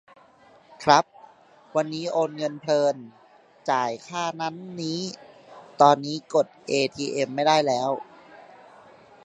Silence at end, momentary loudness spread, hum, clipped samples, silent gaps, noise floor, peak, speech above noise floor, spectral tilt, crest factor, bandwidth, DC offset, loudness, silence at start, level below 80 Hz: 0.85 s; 13 LU; none; under 0.1%; none; -55 dBFS; -2 dBFS; 31 dB; -4.5 dB/octave; 24 dB; 10.5 kHz; under 0.1%; -24 LUFS; 0.8 s; -70 dBFS